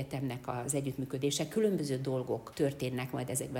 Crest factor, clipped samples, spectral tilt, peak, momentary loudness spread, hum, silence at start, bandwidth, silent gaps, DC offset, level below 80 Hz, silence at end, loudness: 16 dB; under 0.1%; -5 dB/octave; -18 dBFS; 6 LU; none; 0 s; 17 kHz; none; under 0.1%; -64 dBFS; 0 s; -34 LUFS